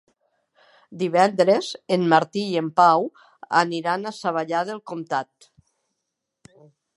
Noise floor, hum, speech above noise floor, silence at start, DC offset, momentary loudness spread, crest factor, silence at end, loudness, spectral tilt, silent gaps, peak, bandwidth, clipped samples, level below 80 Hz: -81 dBFS; none; 59 dB; 0.9 s; under 0.1%; 11 LU; 22 dB; 1.75 s; -22 LUFS; -5.5 dB/octave; none; -2 dBFS; 11.5 kHz; under 0.1%; -76 dBFS